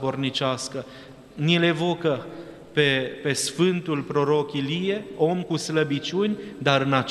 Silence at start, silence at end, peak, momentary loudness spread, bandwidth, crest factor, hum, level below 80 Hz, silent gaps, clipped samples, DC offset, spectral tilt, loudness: 0 s; 0 s; -4 dBFS; 11 LU; 13 kHz; 22 dB; none; -62 dBFS; none; under 0.1%; under 0.1%; -5 dB/octave; -24 LUFS